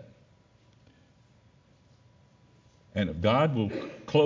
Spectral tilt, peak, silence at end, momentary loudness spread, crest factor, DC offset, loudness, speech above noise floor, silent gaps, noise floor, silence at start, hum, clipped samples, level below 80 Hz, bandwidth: -7.5 dB/octave; -10 dBFS; 0 s; 12 LU; 20 dB; under 0.1%; -28 LUFS; 35 dB; none; -61 dBFS; 0 s; none; under 0.1%; -54 dBFS; 7.6 kHz